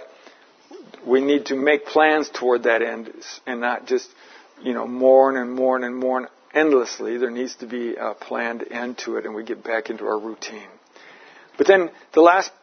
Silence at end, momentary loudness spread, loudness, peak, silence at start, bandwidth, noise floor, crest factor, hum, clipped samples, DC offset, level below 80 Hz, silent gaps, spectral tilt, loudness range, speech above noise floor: 0.1 s; 15 LU; -21 LUFS; 0 dBFS; 0 s; 6.6 kHz; -50 dBFS; 22 dB; none; under 0.1%; under 0.1%; -80 dBFS; none; -3.5 dB/octave; 7 LU; 30 dB